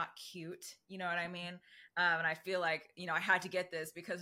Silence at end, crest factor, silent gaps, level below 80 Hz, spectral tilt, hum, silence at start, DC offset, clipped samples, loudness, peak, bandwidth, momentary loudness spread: 0 s; 22 dB; none; -86 dBFS; -3.5 dB/octave; none; 0 s; under 0.1%; under 0.1%; -37 LUFS; -16 dBFS; 16.5 kHz; 15 LU